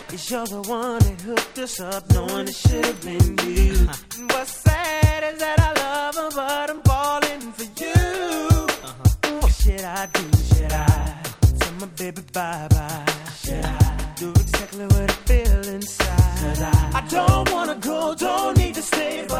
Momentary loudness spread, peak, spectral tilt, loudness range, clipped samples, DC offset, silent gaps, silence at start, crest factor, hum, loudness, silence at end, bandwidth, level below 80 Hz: 8 LU; -2 dBFS; -5 dB/octave; 2 LU; under 0.1%; under 0.1%; none; 0 s; 18 dB; none; -21 LUFS; 0 s; 17 kHz; -26 dBFS